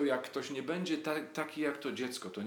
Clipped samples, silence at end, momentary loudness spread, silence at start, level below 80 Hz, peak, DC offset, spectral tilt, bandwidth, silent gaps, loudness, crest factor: under 0.1%; 0 s; 4 LU; 0 s; under -90 dBFS; -18 dBFS; under 0.1%; -4.5 dB/octave; 19 kHz; none; -37 LUFS; 18 dB